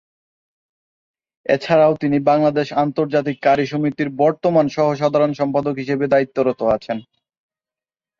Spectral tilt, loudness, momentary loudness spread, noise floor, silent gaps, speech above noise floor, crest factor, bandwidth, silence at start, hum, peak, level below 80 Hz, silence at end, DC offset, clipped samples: -7.5 dB/octave; -18 LUFS; 6 LU; under -90 dBFS; none; over 73 dB; 16 dB; 7.2 kHz; 1.5 s; none; -2 dBFS; -58 dBFS; 1.2 s; under 0.1%; under 0.1%